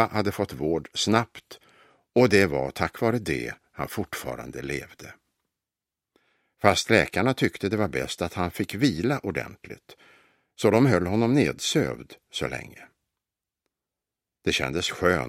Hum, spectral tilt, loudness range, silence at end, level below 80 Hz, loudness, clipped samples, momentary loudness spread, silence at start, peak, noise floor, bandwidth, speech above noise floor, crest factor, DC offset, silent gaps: none; -5 dB/octave; 7 LU; 0 s; -52 dBFS; -25 LUFS; under 0.1%; 16 LU; 0 s; 0 dBFS; -89 dBFS; 16 kHz; 64 dB; 26 dB; under 0.1%; none